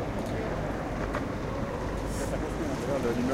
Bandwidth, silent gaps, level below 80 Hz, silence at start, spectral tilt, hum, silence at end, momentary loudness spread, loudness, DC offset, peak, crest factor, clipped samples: 16.5 kHz; none; -40 dBFS; 0 s; -6 dB/octave; none; 0 s; 4 LU; -32 LUFS; under 0.1%; -16 dBFS; 14 dB; under 0.1%